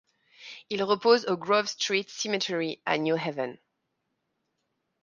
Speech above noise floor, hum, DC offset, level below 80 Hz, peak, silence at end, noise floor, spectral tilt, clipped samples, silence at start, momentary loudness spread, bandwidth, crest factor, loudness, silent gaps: 53 dB; none; under 0.1%; -78 dBFS; -8 dBFS; 1.45 s; -80 dBFS; -3.5 dB/octave; under 0.1%; 0.4 s; 13 LU; 9.6 kHz; 22 dB; -27 LUFS; none